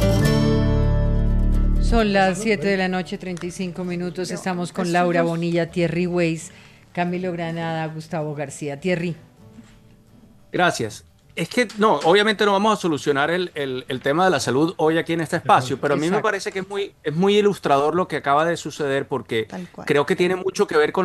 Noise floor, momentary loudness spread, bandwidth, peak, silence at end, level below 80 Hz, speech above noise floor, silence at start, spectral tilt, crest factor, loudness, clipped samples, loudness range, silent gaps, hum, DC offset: -50 dBFS; 10 LU; 14 kHz; -4 dBFS; 0 s; -30 dBFS; 29 dB; 0 s; -5.5 dB/octave; 18 dB; -21 LUFS; under 0.1%; 7 LU; none; none; under 0.1%